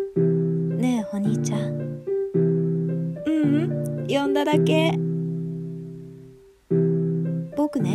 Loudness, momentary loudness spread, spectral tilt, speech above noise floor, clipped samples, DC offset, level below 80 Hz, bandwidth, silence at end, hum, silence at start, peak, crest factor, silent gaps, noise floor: -24 LUFS; 10 LU; -7.5 dB/octave; 27 dB; under 0.1%; under 0.1%; -60 dBFS; 12.5 kHz; 0 s; none; 0 s; -8 dBFS; 16 dB; none; -48 dBFS